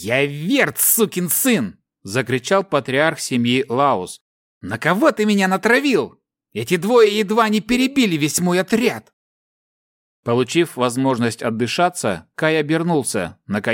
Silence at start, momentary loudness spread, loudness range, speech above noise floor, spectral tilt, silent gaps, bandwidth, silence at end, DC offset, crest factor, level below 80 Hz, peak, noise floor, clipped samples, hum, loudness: 0 s; 10 LU; 4 LU; over 72 dB; -4 dB/octave; 4.21-4.61 s, 9.13-10.23 s; 17 kHz; 0 s; under 0.1%; 18 dB; -56 dBFS; -2 dBFS; under -90 dBFS; under 0.1%; none; -18 LUFS